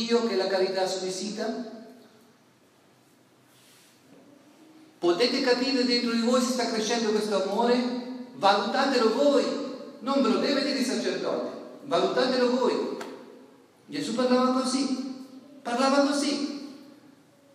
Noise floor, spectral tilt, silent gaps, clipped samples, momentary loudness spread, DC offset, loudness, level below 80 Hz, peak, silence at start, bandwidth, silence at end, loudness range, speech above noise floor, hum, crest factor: -60 dBFS; -3.5 dB/octave; none; under 0.1%; 15 LU; under 0.1%; -26 LUFS; -88 dBFS; -8 dBFS; 0 s; 14 kHz; 0.7 s; 7 LU; 35 dB; none; 18 dB